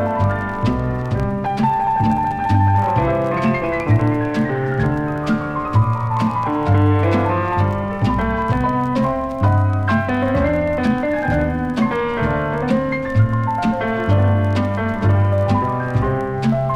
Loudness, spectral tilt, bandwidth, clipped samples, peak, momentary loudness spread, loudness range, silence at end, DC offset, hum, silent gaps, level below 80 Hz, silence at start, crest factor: -18 LUFS; -8.5 dB/octave; 7.8 kHz; under 0.1%; -4 dBFS; 4 LU; 1 LU; 0 s; under 0.1%; none; none; -34 dBFS; 0 s; 14 dB